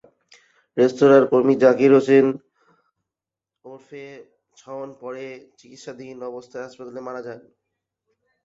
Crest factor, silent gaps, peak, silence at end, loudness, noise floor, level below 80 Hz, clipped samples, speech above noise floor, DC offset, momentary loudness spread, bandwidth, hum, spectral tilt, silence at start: 20 dB; none; -2 dBFS; 1.05 s; -16 LUFS; -88 dBFS; -68 dBFS; under 0.1%; 68 dB; under 0.1%; 25 LU; 7.6 kHz; none; -7 dB/octave; 0.75 s